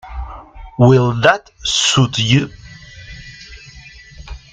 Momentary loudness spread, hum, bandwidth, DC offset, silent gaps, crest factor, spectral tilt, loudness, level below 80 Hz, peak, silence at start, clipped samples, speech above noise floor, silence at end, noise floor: 24 LU; none; 9.2 kHz; under 0.1%; none; 18 dB; -4.5 dB/octave; -14 LUFS; -36 dBFS; 0 dBFS; 0.05 s; under 0.1%; 26 dB; 0.15 s; -39 dBFS